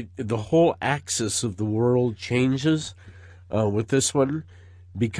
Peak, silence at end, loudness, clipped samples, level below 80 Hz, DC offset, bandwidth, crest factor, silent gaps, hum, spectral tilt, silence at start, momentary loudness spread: -10 dBFS; 0 s; -24 LUFS; under 0.1%; -56 dBFS; under 0.1%; 11 kHz; 14 dB; none; none; -5 dB/octave; 0 s; 9 LU